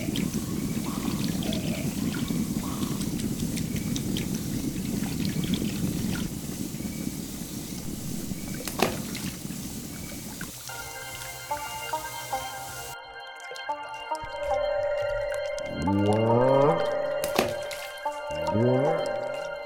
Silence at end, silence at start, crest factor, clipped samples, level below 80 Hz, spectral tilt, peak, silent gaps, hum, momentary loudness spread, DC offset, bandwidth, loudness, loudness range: 0 s; 0 s; 26 dB; under 0.1%; -46 dBFS; -5 dB/octave; -4 dBFS; none; none; 12 LU; under 0.1%; 19 kHz; -29 LUFS; 9 LU